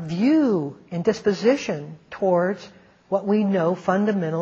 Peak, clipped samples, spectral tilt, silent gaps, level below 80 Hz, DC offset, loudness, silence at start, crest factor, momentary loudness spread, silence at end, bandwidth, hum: -6 dBFS; under 0.1%; -7 dB/octave; none; -64 dBFS; under 0.1%; -22 LUFS; 0 s; 16 dB; 10 LU; 0 s; 7.6 kHz; none